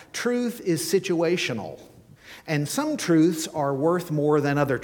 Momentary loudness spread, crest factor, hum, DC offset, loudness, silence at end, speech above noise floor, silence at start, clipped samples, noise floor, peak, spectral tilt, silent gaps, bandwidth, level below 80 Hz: 8 LU; 16 dB; none; under 0.1%; -24 LUFS; 0 s; 24 dB; 0 s; under 0.1%; -47 dBFS; -8 dBFS; -5 dB/octave; none; 19 kHz; -62 dBFS